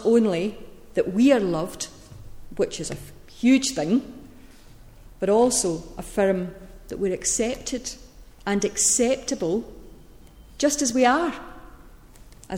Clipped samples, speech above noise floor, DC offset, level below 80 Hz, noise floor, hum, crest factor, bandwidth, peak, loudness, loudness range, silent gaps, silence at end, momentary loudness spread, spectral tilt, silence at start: under 0.1%; 25 dB; under 0.1%; -48 dBFS; -47 dBFS; none; 18 dB; 16.5 kHz; -6 dBFS; -23 LUFS; 3 LU; none; 0 s; 18 LU; -3.5 dB/octave; 0 s